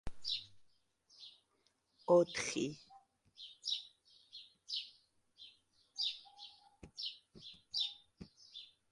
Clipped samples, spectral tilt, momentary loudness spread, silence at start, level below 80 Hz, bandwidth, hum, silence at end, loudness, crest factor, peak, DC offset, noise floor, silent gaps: under 0.1%; -3.5 dB/octave; 23 LU; 0.05 s; -66 dBFS; 11.5 kHz; none; 0.25 s; -38 LUFS; 24 dB; -18 dBFS; under 0.1%; -79 dBFS; none